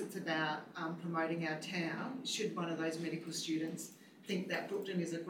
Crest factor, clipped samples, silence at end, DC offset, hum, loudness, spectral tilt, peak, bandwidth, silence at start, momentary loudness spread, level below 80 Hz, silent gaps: 14 dB; under 0.1%; 0 s; under 0.1%; none; -39 LUFS; -4.5 dB/octave; -24 dBFS; 18 kHz; 0 s; 6 LU; under -90 dBFS; none